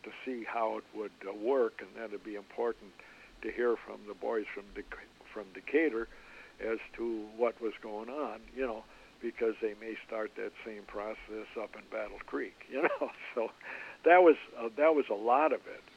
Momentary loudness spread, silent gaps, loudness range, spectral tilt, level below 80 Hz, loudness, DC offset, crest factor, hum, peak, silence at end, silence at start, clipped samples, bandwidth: 17 LU; none; 10 LU; -5.5 dB/octave; -66 dBFS; -34 LUFS; under 0.1%; 24 dB; none; -10 dBFS; 0.15 s; 0.05 s; under 0.1%; 9.2 kHz